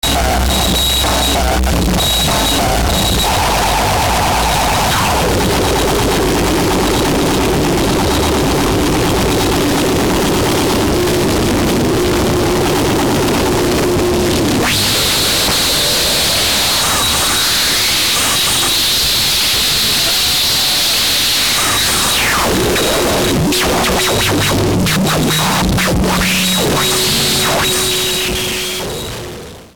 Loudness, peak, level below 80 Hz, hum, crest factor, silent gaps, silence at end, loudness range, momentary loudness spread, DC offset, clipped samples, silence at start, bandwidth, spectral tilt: -12 LUFS; -4 dBFS; -24 dBFS; none; 8 dB; none; 0 s; 3 LU; 3 LU; 1%; under 0.1%; 0 s; over 20 kHz; -3 dB/octave